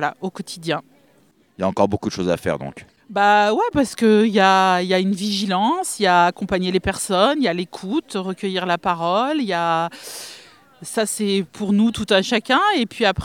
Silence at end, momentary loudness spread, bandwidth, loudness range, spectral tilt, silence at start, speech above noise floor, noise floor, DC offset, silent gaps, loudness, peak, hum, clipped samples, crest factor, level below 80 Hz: 0 s; 12 LU; 17 kHz; 5 LU; -4.5 dB/octave; 0 s; 38 dB; -57 dBFS; under 0.1%; none; -19 LUFS; 0 dBFS; none; under 0.1%; 18 dB; -48 dBFS